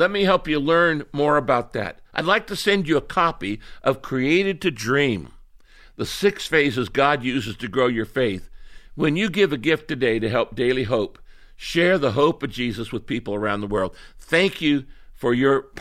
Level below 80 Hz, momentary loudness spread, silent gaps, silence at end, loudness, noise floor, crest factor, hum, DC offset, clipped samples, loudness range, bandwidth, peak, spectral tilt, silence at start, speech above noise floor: -46 dBFS; 9 LU; none; 0 s; -22 LUFS; -48 dBFS; 18 dB; none; under 0.1%; under 0.1%; 2 LU; 15 kHz; -4 dBFS; -5.5 dB/octave; 0 s; 27 dB